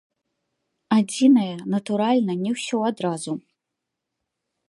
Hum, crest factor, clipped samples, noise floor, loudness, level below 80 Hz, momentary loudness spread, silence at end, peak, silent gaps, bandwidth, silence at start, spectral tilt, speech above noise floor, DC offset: none; 16 dB; under 0.1%; -83 dBFS; -22 LUFS; -74 dBFS; 11 LU; 1.3 s; -6 dBFS; none; 11.5 kHz; 0.9 s; -5.5 dB/octave; 61 dB; under 0.1%